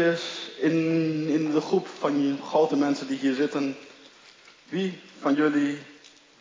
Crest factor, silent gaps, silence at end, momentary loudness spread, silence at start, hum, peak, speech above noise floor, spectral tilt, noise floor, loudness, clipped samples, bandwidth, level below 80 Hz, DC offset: 16 dB; none; 0.45 s; 9 LU; 0 s; none; -10 dBFS; 28 dB; -6 dB/octave; -53 dBFS; -26 LUFS; under 0.1%; 7.6 kHz; -82 dBFS; under 0.1%